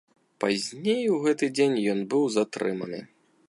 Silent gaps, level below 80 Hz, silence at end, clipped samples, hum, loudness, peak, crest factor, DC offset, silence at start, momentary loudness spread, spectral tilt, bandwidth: none; -74 dBFS; 0.45 s; under 0.1%; none; -26 LUFS; -10 dBFS; 16 dB; under 0.1%; 0.4 s; 8 LU; -5 dB/octave; 11.5 kHz